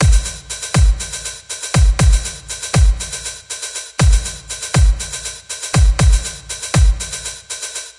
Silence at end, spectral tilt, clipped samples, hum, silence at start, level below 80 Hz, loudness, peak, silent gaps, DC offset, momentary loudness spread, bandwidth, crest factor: 0.1 s; -4 dB/octave; under 0.1%; none; 0 s; -16 dBFS; -18 LUFS; -2 dBFS; none; under 0.1%; 11 LU; 11.5 kHz; 14 dB